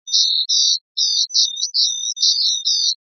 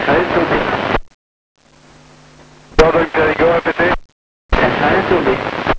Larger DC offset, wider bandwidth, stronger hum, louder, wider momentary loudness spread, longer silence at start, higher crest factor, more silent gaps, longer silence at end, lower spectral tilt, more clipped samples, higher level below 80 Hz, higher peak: neither; second, 6.6 kHz vs 8 kHz; neither; about the same, -15 LUFS vs -15 LUFS; second, 3 LU vs 7 LU; about the same, 0.05 s vs 0 s; about the same, 18 dB vs 16 dB; second, 0.81-0.95 s vs 1.14-1.55 s, 4.05-4.49 s; about the same, 0.1 s vs 0 s; second, 14 dB/octave vs -6 dB/octave; neither; second, under -90 dBFS vs -30 dBFS; about the same, 0 dBFS vs 0 dBFS